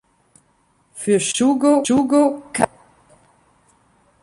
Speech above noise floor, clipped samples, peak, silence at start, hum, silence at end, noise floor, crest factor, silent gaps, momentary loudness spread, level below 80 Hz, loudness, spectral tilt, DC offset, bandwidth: 44 dB; under 0.1%; -2 dBFS; 0.95 s; none; 1.55 s; -61 dBFS; 18 dB; none; 7 LU; -58 dBFS; -18 LUFS; -4 dB/octave; under 0.1%; 11.5 kHz